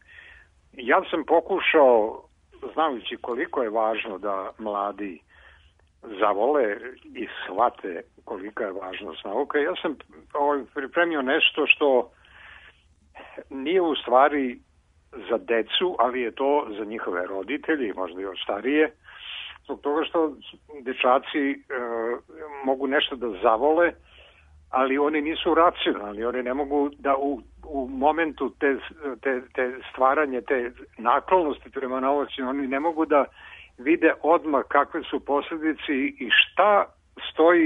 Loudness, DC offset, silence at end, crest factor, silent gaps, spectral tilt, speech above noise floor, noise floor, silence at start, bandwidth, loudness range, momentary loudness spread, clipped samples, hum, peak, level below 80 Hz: -24 LUFS; under 0.1%; 0 s; 20 dB; none; -6 dB/octave; 34 dB; -58 dBFS; 0.15 s; 3.9 kHz; 5 LU; 15 LU; under 0.1%; none; -4 dBFS; -58 dBFS